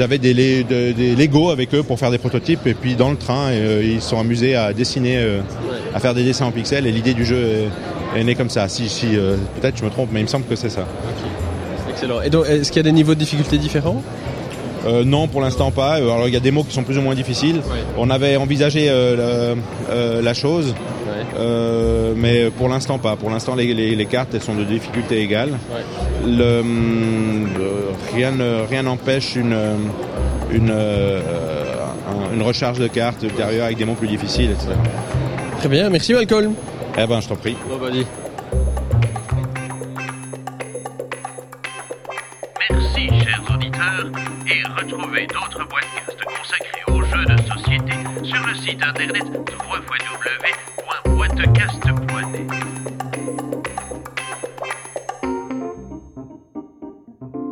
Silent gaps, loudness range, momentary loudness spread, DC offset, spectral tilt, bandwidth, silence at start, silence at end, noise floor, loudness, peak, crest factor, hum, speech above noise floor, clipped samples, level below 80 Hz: none; 6 LU; 12 LU; under 0.1%; -6 dB/octave; 17 kHz; 0 s; 0 s; -38 dBFS; -19 LUFS; 0 dBFS; 18 dB; none; 21 dB; under 0.1%; -32 dBFS